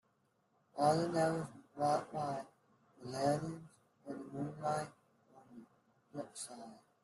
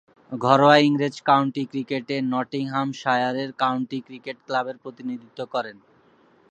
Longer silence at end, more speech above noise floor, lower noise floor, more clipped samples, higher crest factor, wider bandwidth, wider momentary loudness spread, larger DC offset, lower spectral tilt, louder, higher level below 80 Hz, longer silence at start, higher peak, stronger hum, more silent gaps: second, 0.25 s vs 0.8 s; first, 40 dB vs 35 dB; first, -77 dBFS vs -58 dBFS; neither; about the same, 20 dB vs 22 dB; first, 12.5 kHz vs 9.2 kHz; first, 23 LU vs 17 LU; neither; about the same, -5.5 dB/octave vs -6 dB/octave; second, -38 LUFS vs -23 LUFS; about the same, -76 dBFS vs -74 dBFS; first, 0.75 s vs 0.3 s; second, -20 dBFS vs 0 dBFS; neither; neither